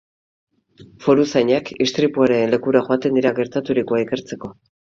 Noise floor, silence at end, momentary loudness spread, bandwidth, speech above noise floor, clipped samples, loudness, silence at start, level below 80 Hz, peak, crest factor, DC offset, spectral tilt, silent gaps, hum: -47 dBFS; 0.4 s; 9 LU; 7.6 kHz; 29 dB; under 0.1%; -18 LUFS; 0.8 s; -58 dBFS; 0 dBFS; 18 dB; under 0.1%; -6 dB/octave; none; none